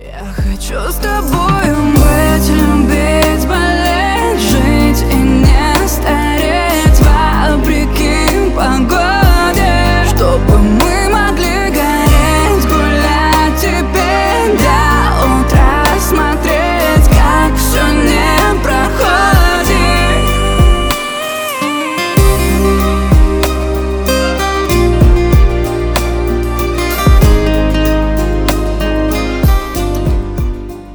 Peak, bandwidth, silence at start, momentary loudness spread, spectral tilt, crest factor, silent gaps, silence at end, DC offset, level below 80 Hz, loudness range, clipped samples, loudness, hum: 0 dBFS; over 20 kHz; 0 s; 6 LU; -5 dB/octave; 10 dB; none; 0 s; under 0.1%; -14 dBFS; 2 LU; under 0.1%; -11 LUFS; none